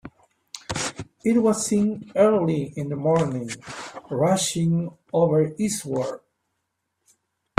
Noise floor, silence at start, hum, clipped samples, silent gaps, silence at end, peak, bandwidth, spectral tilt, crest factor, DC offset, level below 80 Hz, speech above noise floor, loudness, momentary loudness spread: -77 dBFS; 0.05 s; none; under 0.1%; none; 1.4 s; 0 dBFS; 15.5 kHz; -5.5 dB/octave; 24 dB; under 0.1%; -58 dBFS; 55 dB; -23 LUFS; 14 LU